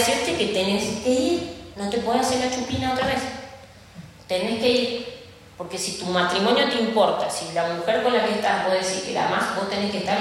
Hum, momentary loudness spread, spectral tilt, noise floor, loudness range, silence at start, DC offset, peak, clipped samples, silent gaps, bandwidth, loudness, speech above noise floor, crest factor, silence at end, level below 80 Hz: none; 12 LU; -3.5 dB/octave; -44 dBFS; 4 LU; 0 s; under 0.1%; -6 dBFS; under 0.1%; none; 16 kHz; -23 LUFS; 22 dB; 18 dB; 0 s; -52 dBFS